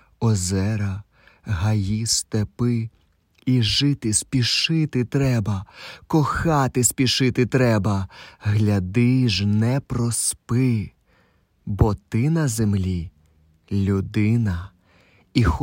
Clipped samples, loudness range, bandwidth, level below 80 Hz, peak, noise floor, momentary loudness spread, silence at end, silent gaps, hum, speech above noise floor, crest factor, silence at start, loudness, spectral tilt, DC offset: under 0.1%; 4 LU; 16.5 kHz; -40 dBFS; -4 dBFS; -61 dBFS; 11 LU; 0 s; none; none; 40 dB; 18 dB; 0.2 s; -21 LUFS; -5 dB/octave; under 0.1%